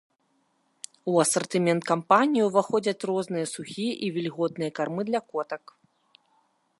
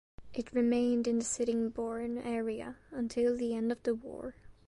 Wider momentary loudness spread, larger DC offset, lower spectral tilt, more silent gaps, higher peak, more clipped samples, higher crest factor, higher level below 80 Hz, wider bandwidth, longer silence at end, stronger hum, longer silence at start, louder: about the same, 12 LU vs 13 LU; neither; about the same, -4.5 dB/octave vs -4.5 dB/octave; neither; first, -4 dBFS vs -18 dBFS; neither; first, 22 dB vs 14 dB; second, -76 dBFS vs -62 dBFS; about the same, 12 kHz vs 11.5 kHz; first, 1.2 s vs 0.15 s; neither; first, 1.05 s vs 0.2 s; first, -26 LUFS vs -34 LUFS